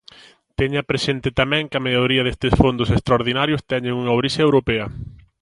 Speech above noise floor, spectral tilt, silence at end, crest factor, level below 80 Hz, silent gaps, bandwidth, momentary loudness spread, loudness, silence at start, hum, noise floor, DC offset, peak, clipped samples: 28 dB; -6 dB/octave; 0.3 s; 20 dB; -36 dBFS; none; 11.5 kHz; 7 LU; -19 LUFS; 0.6 s; none; -47 dBFS; under 0.1%; 0 dBFS; under 0.1%